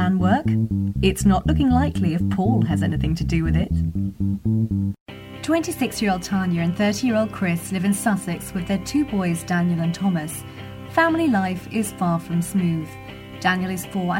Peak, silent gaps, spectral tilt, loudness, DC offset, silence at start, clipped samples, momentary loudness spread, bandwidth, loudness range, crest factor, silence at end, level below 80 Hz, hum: -4 dBFS; 5.01-5.06 s; -6 dB/octave; -22 LUFS; under 0.1%; 0 s; under 0.1%; 8 LU; 16.5 kHz; 3 LU; 16 dB; 0 s; -36 dBFS; none